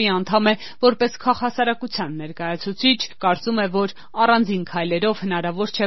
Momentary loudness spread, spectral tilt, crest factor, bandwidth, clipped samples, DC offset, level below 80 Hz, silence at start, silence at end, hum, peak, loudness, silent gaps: 8 LU; -3 dB/octave; 18 dB; 6.2 kHz; under 0.1%; 1%; -60 dBFS; 0 s; 0 s; none; -2 dBFS; -21 LUFS; none